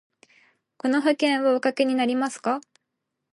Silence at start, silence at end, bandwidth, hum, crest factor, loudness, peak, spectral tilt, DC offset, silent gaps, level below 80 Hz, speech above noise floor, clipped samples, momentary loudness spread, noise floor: 0.85 s; 0.75 s; 11.5 kHz; none; 16 dB; -23 LUFS; -8 dBFS; -3.5 dB/octave; under 0.1%; none; -80 dBFS; 58 dB; under 0.1%; 7 LU; -81 dBFS